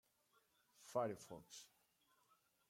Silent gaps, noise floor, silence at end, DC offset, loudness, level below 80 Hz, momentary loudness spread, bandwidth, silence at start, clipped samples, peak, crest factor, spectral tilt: none; -80 dBFS; 1.05 s; under 0.1%; -48 LUFS; -88 dBFS; 20 LU; 16.5 kHz; 0.8 s; under 0.1%; -30 dBFS; 24 dB; -4.5 dB/octave